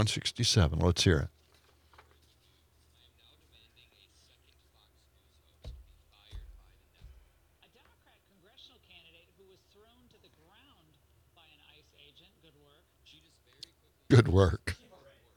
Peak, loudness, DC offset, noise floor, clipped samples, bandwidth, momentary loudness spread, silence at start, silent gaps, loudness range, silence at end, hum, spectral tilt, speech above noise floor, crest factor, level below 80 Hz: -8 dBFS; -27 LUFS; under 0.1%; -67 dBFS; under 0.1%; 15 kHz; 27 LU; 0 s; none; 28 LU; 0.6 s; none; -5 dB/octave; 41 dB; 26 dB; -52 dBFS